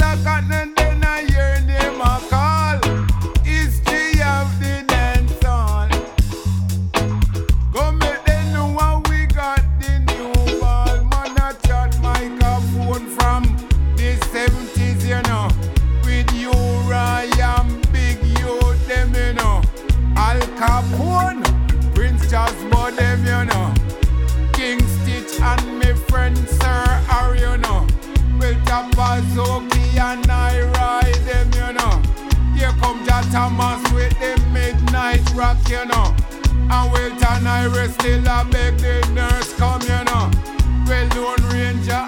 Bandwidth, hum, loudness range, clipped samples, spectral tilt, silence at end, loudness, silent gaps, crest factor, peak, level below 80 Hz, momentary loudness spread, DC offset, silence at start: 17 kHz; none; 1 LU; under 0.1%; -5.5 dB/octave; 0 s; -18 LUFS; none; 14 dB; -2 dBFS; -18 dBFS; 3 LU; under 0.1%; 0 s